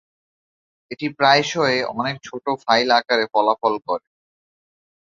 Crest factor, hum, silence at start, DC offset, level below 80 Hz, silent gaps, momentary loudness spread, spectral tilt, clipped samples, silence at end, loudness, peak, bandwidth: 20 dB; none; 0.9 s; under 0.1%; -66 dBFS; none; 12 LU; -4 dB/octave; under 0.1%; 1.15 s; -19 LUFS; -2 dBFS; 7.6 kHz